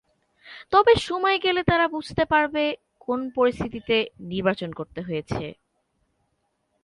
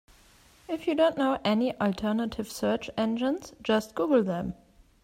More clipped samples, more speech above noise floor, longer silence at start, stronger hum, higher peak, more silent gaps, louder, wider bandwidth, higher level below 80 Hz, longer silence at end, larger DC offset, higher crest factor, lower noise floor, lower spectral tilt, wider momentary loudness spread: neither; first, 50 dB vs 31 dB; second, 0.45 s vs 0.7 s; neither; first, -6 dBFS vs -12 dBFS; neither; first, -23 LUFS vs -28 LUFS; second, 11.5 kHz vs 16 kHz; first, -50 dBFS vs -58 dBFS; first, 1.3 s vs 0.5 s; neither; about the same, 20 dB vs 16 dB; first, -73 dBFS vs -58 dBFS; about the same, -5.5 dB/octave vs -5.5 dB/octave; first, 13 LU vs 8 LU